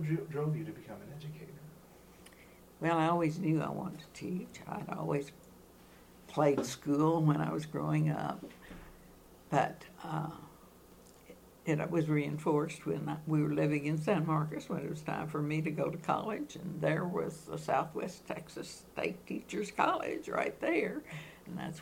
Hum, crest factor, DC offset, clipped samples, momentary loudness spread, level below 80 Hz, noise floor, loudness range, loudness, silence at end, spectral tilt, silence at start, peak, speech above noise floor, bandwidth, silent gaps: none; 22 dB; under 0.1%; under 0.1%; 16 LU; -66 dBFS; -58 dBFS; 4 LU; -35 LUFS; 0 s; -7 dB/octave; 0 s; -14 dBFS; 24 dB; 16.5 kHz; none